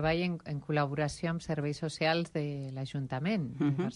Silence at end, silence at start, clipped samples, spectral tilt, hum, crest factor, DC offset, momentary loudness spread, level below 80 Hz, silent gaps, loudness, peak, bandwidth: 0 s; 0 s; under 0.1%; -6.5 dB/octave; none; 16 dB; under 0.1%; 7 LU; -58 dBFS; none; -33 LUFS; -16 dBFS; 11 kHz